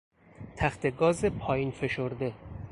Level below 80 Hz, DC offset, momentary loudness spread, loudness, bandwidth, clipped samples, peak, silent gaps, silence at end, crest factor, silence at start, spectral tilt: -50 dBFS; under 0.1%; 16 LU; -30 LUFS; 11.5 kHz; under 0.1%; -10 dBFS; none; 0 s; 20 dB; 0.4 s; -6.5 dB/octave